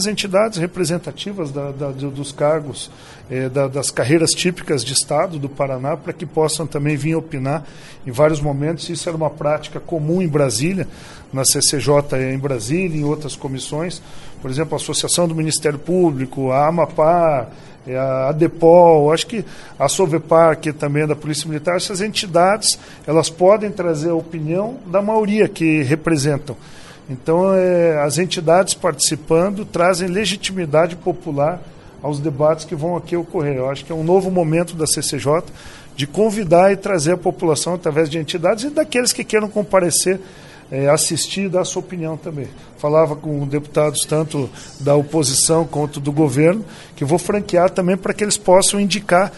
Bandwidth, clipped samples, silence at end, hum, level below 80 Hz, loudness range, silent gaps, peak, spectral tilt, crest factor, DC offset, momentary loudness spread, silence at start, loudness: 12 kHz; under 0.1%; 0 s; none; -46 dBFS; 5 LU; none; 0 dBFS; -4.5 dB/octave; 18 dB; under 0.1%; 11 LU; 0 s; -17 LUFS